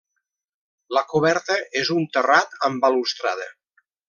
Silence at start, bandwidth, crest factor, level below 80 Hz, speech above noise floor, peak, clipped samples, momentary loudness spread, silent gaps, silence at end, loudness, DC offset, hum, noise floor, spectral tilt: 0.9 s; 7.4 kHz; 22 dB; -72 dBFS; 58 dB; -2 dBFS; under 0.1%; 8 LU; none; 0.55 s; -21 LUFS; under 0.1%; none; -79 dBFS; -4 dB/octave